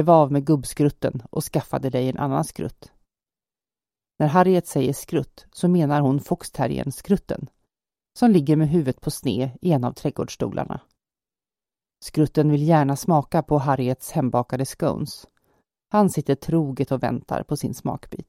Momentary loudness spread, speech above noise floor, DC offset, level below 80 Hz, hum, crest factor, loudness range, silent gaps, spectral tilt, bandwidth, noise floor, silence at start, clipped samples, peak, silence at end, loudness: 11 LU; over 69 dB; under 0.1%; -50 dBFS; none; 20 dB; 4 LU; none; -7 dB/octave; 16 kHz; under -90 dBFS; 0 s; under 0.1%; -4 dBFS; 0.05 s; -22 LUFS